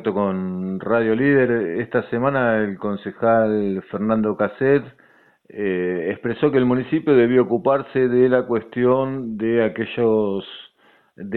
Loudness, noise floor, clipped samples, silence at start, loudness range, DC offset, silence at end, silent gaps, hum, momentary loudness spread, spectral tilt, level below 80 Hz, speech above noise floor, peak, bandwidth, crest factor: -20 LUFS; -57 dBFS; under 0.1%; 0 s; 3 LU; under 0.1%; 0 s; none; none; 9 LU; -10.5 dB/octave; -54 dBFS; 38 dB; -4 dBFS; 4.3 kHz; 16 dB